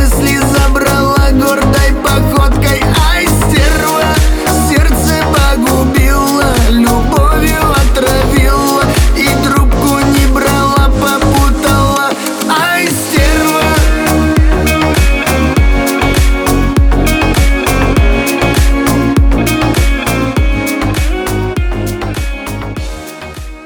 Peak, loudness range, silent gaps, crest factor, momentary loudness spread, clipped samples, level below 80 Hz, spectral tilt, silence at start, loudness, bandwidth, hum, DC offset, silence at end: 0 dBFS; 2 LU; none; 8 dB; 5 LU; under 0.1%; -14 dBFS; -5 dB/octave; 0 s; -10 LUFS; over 20 kHz; none; under 0.1%; 0 s